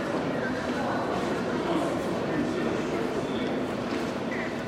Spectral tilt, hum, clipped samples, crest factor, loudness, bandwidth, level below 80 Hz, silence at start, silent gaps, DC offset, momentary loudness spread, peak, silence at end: -6 dB/octave; none; under 0.1%; 14 dB; -29 LUFS; 15 kHz; -54 dBFS; 0 s; none; under 0.1%; 3 LU; -16 dBFS; 0 s